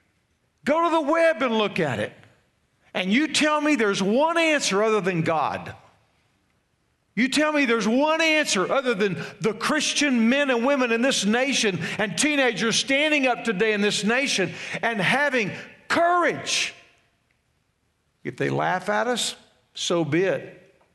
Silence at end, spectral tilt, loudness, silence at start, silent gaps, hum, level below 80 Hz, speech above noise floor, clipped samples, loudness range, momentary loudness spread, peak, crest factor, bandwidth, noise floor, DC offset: 0.4 s; -3.5 dB/octave; -22 LUFS; 0.65 s; none; none; -68 dBFS; 48 dB; under 0.1%; 5 LU; 9 LU; -6 dBFS; 16 dB; 12 kHz; -70 dBFS; under 0.1%